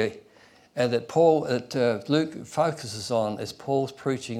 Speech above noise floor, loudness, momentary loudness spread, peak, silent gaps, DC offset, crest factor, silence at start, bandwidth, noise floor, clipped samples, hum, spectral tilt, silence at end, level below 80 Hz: 30 dB; -26 LUFS; 10 LU; -8 dBFS; none; under 0.1%; 18 dB; 0 s; 13.5 kHz; -56 dBFS; under 0.1%; none; -5.5 dB/octave; 0 s; -68 dBFS